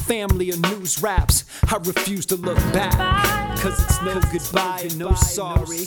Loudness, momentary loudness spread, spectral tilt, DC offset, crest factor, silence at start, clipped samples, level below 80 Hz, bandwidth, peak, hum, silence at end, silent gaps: -21 LUFS; 4 LU; -4 dB/octave; under 0.1%; 18 dB; 0 s; under 0.1%; -26 dBFS; 20 kHz; -2 dBFS; none; 0 s; none